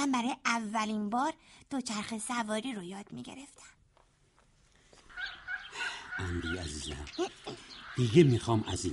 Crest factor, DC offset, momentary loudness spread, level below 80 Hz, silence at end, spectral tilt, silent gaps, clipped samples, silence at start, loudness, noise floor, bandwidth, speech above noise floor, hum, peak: 24 dB; under 0.1%; 19 LU; -56 dBFS; 0 s; -5 dB/octave; none; under 0.1%; 0 s; -33 LUFS; -67 dBFS; 11.5 kHz; 34 dB; none; -10 dBFS